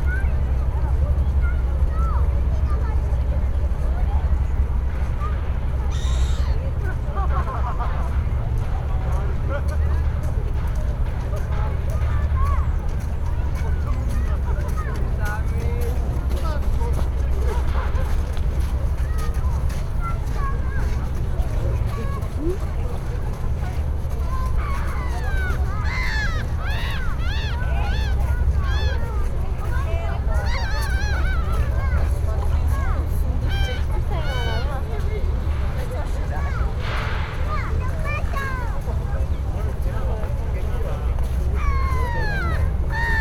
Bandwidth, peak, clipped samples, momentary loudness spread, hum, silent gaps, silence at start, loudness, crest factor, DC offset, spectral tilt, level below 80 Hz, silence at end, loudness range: 12.5 kHz; -8 dBFS; under 0.1%; 4 LU; none; none; 0 s; -24 LUFS; 12 dB; under 0.1%; -6.5 dB/octave; -22 dBFS; 0 s; 3 LU